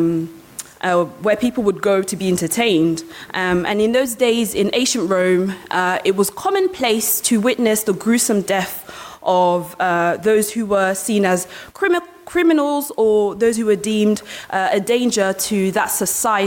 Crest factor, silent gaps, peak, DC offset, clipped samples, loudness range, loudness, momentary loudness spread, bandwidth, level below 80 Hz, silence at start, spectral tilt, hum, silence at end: 14 dB; none; -4 dBFS; under 0.1%; under 0.1%; 1 LU; -18 LUFS; 6 LU; 17 kHz; -54 dBFS; 0 s; -4 dB/octave; none; 0 s